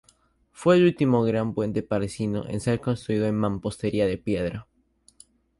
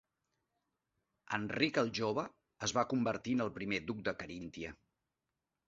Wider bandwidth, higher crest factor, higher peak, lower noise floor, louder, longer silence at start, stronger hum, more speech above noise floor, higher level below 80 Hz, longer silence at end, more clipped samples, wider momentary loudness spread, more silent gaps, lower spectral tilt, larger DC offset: first, 11.5 kHz vs 7.8 kHz; about the same, 20 dB vs 24 dB; first, -6 dBFS vs -16 dBFS; second, -62 dBFS vs -89 dBFS; first, -25 LUFS vs -37 LUFS; second, 0.6 s vs 1.3 s; neither; second, 39 dB vs 52 dB; first, -50 dBFS vs -68 dBFS; about the same, 0.95 s vs 0.95 s; neither; second, 9 LU vs 12 LU; neither; first, -7 dB/octave vs -3.5 dB/octave; neither